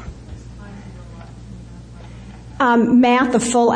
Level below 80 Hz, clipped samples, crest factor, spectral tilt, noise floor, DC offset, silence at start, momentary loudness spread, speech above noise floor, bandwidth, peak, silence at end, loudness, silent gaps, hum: -40 dBFS; under 0.1%; 16 dB; -5 dB/octave; -37 dBFS; under 0.1%; 0 s; 25 LU; 23 dB; 10 kHz; -4 dBFS; 0 s; -15 LUFS; none; none